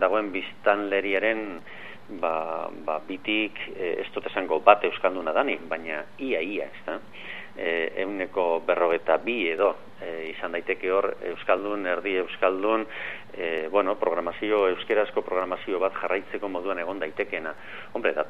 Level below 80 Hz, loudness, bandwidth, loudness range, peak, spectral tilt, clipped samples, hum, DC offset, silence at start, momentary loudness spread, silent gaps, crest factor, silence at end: -70 dBFS; -27 LUFS; 6.8 kHz; 4 LU; -2 dBFS; -6 dB/octave; under 0.1%; none; 0.7%; 0 s; 11 LU; none; 24 dB; 0 s